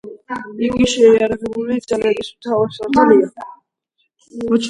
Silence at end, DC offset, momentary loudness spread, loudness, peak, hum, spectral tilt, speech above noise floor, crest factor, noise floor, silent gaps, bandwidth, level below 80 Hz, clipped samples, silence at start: 0 s; under 0.1%; 17 LU; -16 LUFS; 0 dBFS; none; -5 dB/octave; 53 dB; 16 dB; -68 dBFS; none; 11 kHz; -48 dBFS; under 0.1%; 0.05 s